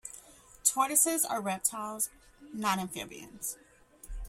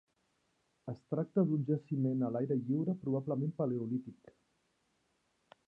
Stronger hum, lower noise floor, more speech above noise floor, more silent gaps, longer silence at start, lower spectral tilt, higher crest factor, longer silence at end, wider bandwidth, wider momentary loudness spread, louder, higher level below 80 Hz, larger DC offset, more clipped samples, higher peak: neither; second, -55 dBFS vs -78 dBFS; second, 23 dB vs 43 dB; neither; second, 0.05 s vs 0.85 s; second, -2 dB/octave vs -12 dB/octave; first, 26 dB vs 18 dB; second, 0 s vs 1.55 s; first, 16.5 kHz vs 5.2 kHz; first, 21 LU vs 12 LU; first, -30 LUFS vs -35 LUFS; first, -52 dBFS vs -78 dBFS; neither; neither; first, -8 dBFS vs -20 dBFS